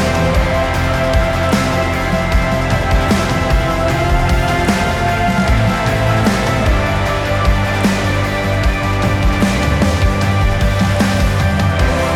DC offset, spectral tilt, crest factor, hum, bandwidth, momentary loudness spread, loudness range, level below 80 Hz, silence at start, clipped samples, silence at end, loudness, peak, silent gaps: under 0.1%; -5.5 dB/octave; 10 dB; none; 16.5 kHz; 2 LU; 1 LU; -20 dBFS; 0 s; under 0.1%; 0 s; -15 LUFS; -2 dBFS; none